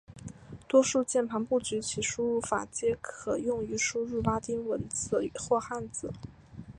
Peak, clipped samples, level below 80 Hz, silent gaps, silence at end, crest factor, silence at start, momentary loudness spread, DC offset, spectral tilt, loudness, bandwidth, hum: -10 dBFS; under 0.1%; -56 dBFS; none; 0 s; 20 dB; 0.1 s; 18 LU; under 0.1%; -4 dB/octave; -30 LUFS; 11.5 kHz; none